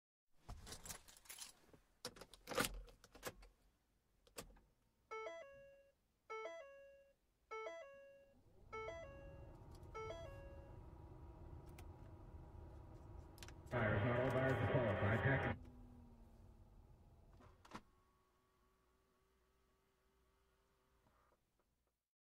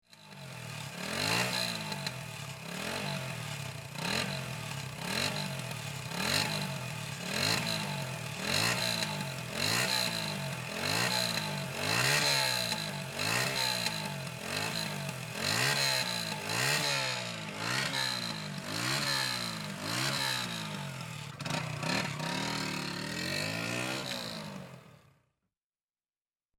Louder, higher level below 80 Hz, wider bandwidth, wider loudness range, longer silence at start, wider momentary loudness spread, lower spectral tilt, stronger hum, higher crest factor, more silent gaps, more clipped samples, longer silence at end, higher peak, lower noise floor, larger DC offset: second, -45 LUFS vs -32 LUFS; about the same, -64 dBFS vs -64 dBFS; second, 15.5 kHz vs 17.5 kHz; first, 24 LU vs 6 LU; first, 0.35 s vs 0.1 s; first, 25 LU vs 11 LU; first, -5.5 dB/octave vs -2.5 dB/octave; neither; first, 24 dB vs 18 dB; neither; neither; first, 4.45 s vs 1.6 s; second, -24 dBFS vs -16 dBFS; about the same, -87 dBFS vs under -90 dBFS; neither